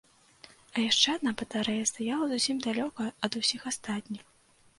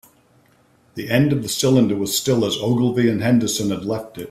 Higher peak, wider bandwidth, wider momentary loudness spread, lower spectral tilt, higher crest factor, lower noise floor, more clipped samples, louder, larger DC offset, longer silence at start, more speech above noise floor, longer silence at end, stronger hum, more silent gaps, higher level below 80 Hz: second, -10 dBFS vs -2 dBFS; second, 11.5 kHz vs 16 kHz; first, 12 LU vs 9 LU; second, -2 dB/octave vs -5 dB/octave; about the same, 22 dB vs 18 dB; about the same, -57 dBFS vs -56 dBFS; neither; second, -29 LUFS vs -19 LUFS; neither; second, 0.75 s vs 0.95 s; second, 26 dB vs 38 dB; first, 0.6 s vs 0 s; neither; neither; second, -68 dBFS vs -54 dBFS